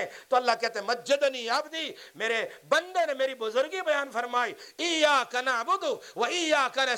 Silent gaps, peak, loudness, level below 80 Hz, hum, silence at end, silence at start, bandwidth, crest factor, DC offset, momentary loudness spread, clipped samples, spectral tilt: none; -10 dBFS; -27 LUFS; -82 dBFS; none; 0 s; 0 s; 17 kHz; 18 dB; under 0.1%; 7 LU; under 0.1%; -1 dB/octave